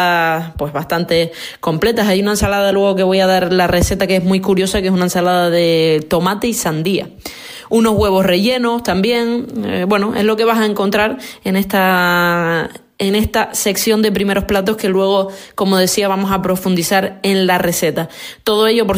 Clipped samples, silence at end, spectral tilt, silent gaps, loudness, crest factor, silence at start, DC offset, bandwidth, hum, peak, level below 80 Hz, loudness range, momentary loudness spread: under 0.1%; 0 s; -4.5 dB/octave; none; -15 LUFS; 12 dB; 0 s; under 0.1%; 16 kHz; none; -2 dBFS; -36 dBFS; 2 LU; 7 LU